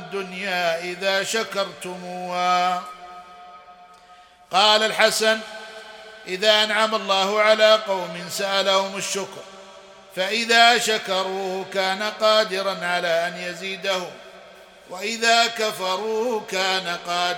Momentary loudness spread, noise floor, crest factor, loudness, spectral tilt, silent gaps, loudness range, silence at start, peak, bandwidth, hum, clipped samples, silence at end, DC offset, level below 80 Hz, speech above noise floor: 19 LU; -49 dBFS; 22 dB; -21 LUFS; -1.5 dB/octave; none; 5 LU; 0 s; 0 dBFS; 18 kHz; none; under 0.1%; 0 s; under 0.1%; -70 dBFS; 28 dB